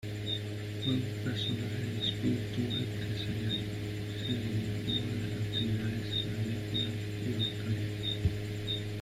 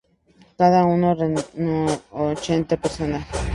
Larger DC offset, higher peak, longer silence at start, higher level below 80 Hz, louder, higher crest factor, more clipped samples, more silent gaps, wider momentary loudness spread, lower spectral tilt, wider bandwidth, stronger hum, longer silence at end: neither; second, -18 dBFS vs -2 dBFS; second, 0 s vs 0.6 s; second, -52 dBFS vs -40 dBFS; second, -34 LUFS vs -21 LUFS; about the same, 16 dB vs 18 dB; neither; neither; second, 3 LU vs 9 LU; about the same, -6 dB/octave vs -6.5 dB/octave; first, 15 kHz vs 11.5 kHz; neither; about the same, 0 s vs 0 s